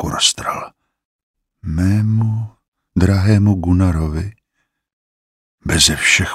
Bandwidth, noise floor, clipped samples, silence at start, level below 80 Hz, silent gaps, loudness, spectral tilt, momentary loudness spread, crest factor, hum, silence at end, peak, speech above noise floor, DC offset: 15 kHz; -71 dBFS; under 0.1%; 0 s; -32 dBFS; 1.05-1.34 s, 2.68-2.72 s, 4.93-5.58 s; -16 LUFS; -4 dB/octave; 17 LU; 18 dB; none; 0 s; 0 dBFS; 57 dB; under 0.1%